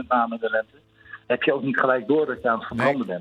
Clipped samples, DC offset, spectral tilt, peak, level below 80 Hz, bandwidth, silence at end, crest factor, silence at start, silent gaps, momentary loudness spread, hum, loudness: under 0.1%; under 0.1%; -7 dB/octave; -8 dBFS; -62 dBFS; 10 kHz; 0 s; 16 dB; 0 s; none; 6 LU; none; -23 LUFS